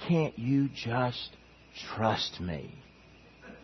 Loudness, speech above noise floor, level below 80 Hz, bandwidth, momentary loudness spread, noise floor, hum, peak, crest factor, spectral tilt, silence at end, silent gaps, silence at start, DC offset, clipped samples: -31 LUFS; 25 dB; -60 dBFS; 6.4 kHz; 20 LU; -56 dBFS; none; -12 dBFS; 20 dB; -6.5 dB/octave; 0 s; none; 0 s; under 0.1%; under 0.1%